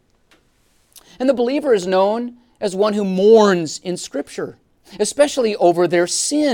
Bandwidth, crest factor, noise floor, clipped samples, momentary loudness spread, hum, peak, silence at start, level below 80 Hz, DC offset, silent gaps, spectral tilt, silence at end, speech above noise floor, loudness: 17.5 kHz; 16 dB; -59 dBFS; under 0.1%; 14 LU; none; 0 dBFS; 1.2 s; -60 dBFS; under 0.1%; none; -4.5 dB/octave; 0 s; 42 dB; -17 LUFS